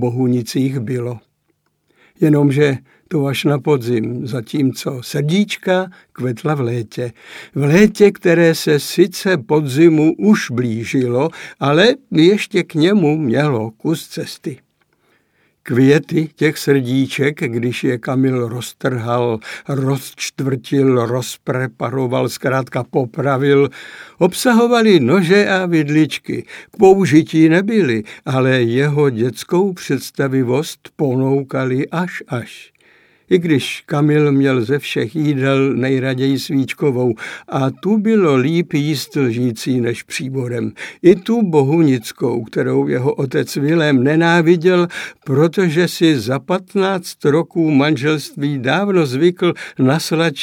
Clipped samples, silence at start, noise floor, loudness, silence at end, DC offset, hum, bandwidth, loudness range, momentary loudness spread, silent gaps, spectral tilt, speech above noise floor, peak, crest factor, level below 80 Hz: under 0.1%; 0 s; -65 dBFS; -16 LUFS; 0 s; under 0.1%; none; 17 kHz; 5 LU; 10 LU; none; -6.5 dB/octave; 50 dB; 0 dBFS; 16 dB; -60 dBFS